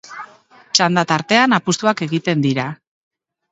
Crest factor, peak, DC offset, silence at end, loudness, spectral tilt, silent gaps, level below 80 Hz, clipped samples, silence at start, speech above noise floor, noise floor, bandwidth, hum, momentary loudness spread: 18 dB; 0 dBFS; under 0.1%; 0.8 s; -16 LUFS; -4 dB/octave; none; -62 dBFS; under 0.1%; 0.05 s; 29 dB; -46 dBFS; 8.2 kHz; none; 12 LU